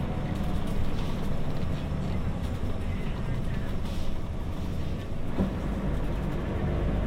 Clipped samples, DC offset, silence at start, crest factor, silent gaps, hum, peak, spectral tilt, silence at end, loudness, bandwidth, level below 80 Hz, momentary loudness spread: under 0.1%; under 0.1%; 0 s; 14 dB; none; none; -14 dBFS; -7.5 dB/octave; 0 s; -32 LUFS; 10.5 kHz; -32 dBFS; 4 LU